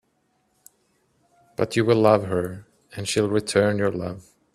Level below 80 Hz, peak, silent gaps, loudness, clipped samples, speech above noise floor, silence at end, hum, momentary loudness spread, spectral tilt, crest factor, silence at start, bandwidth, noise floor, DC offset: -58 dBFS; -2 dBFS; none; -22 LUFS; under 0.1%; 47 dB; 0.35 s; none; 20 LU; -5.5 dB/octave; 22 dB; 1.6 s; 14 kHz; -69 dBFS; under 0.1%